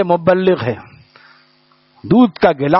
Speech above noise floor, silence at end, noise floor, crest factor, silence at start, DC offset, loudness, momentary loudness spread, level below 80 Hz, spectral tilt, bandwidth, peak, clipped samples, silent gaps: 41 dB; 0 s; -54 dBFS; 14 dB; 0 s; under 0.1%; -14 LUFS; 15 LU; -52 dBFS; -6 dB/octave; 5.8 kHz; 0 dBFS; under 0.1%; none